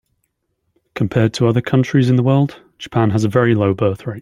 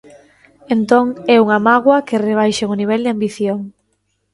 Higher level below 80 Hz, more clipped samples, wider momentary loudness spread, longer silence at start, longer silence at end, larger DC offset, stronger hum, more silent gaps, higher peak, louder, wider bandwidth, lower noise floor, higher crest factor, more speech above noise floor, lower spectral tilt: first, -50 dBFS vs -58 dBFS; neither; about the same, 9 LU vs 9 LU; first, 0.95 s vs 0.7 s; second, 0 s vs 0.65 s; neither; neither; neither; about the same, -2 dBFS vs 0 dBFS; about the same, -16 LUFS vs -15 LUFS; about the same, 11.5 kHz vs 11.5 kHz; first, -70 dBFS vs -66 dBFS; about the same, 14 dB vs 16 dB; about the same, 55 dB vs 52 dB; first, -7.5 dB/octave vs -5.5 dB/octave